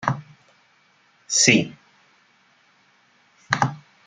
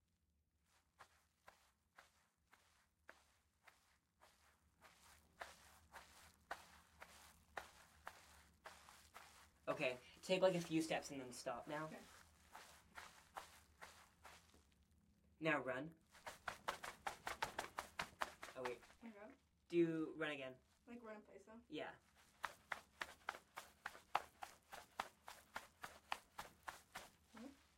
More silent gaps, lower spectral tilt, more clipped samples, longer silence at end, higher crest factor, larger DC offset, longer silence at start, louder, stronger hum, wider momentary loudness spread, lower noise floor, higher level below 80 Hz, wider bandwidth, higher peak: neither; second, -2.5 dB/octave vs -4.5 dB/octave; neither; about the same, 0.3 s vs 0.25 s; second, 24 dB vs 30 dB; neither; second, 0 s vs 1 s; first, -20 LUFS vs -48 LUFS; neither; second, 16 LU vs 22 LU; second, -60 dBFS vs -85 dBFS; first, -64 dBFS vs -80 dBFS; second, 11 kHz vs 16 kHz; first, -2 dBFS vs -20 dBFS